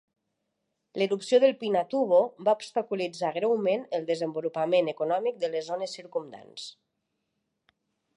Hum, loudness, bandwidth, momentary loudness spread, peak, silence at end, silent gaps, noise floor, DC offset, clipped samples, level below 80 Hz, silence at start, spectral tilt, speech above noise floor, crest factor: none; -27 LUFS; 11 kHz; 13 LU; -10 dBFS; 1.45 s; none; -80 dBFS; under 0.1%; under 0.1%; -84 dBFS; 0.95 s; -5 dB/octave; 53 dB; 18 dB